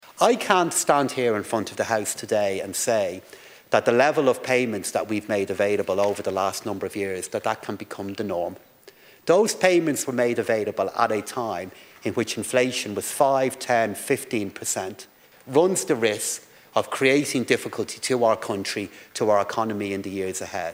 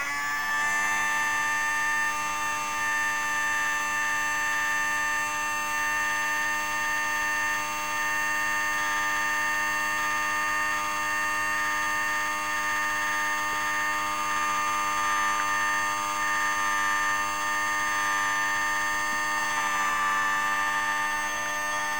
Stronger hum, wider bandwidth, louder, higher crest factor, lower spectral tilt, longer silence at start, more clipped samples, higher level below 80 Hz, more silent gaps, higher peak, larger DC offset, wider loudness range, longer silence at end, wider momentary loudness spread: neither; second, 16.5 kHz vs over 20 kHz; about the same, -24 LUFS vs -26 LUFS; first, 22 dB vs 14 dB; first, -3.5 dB/octave vs 0 dB/octave; about the same, 0.1 s vs 0 s; neither; second, -70 dBFS vs -60 dBFS; neither; first, 0 dBFS vs -14 dBFS; second, under 0.1% vs 0.7%; about the same, 3 LU vs 1 LU; about the same, 0 s vs 0 s; first, 10 LU vs 2 LU